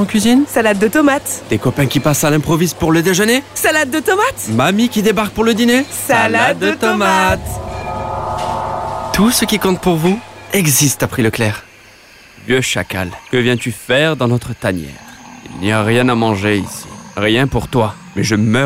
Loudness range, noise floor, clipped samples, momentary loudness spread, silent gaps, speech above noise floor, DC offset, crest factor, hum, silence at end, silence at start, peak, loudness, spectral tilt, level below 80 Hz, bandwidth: 4 LU; -42 dBFS; under 0.1%; 10 LU; none; 28 dB; 0.3%; 12 dB; none; 0 s; 0 s; -2 dBFS; -14 LUFS; -4.5 dB/octave; -38 dBFS; 16.5 kHz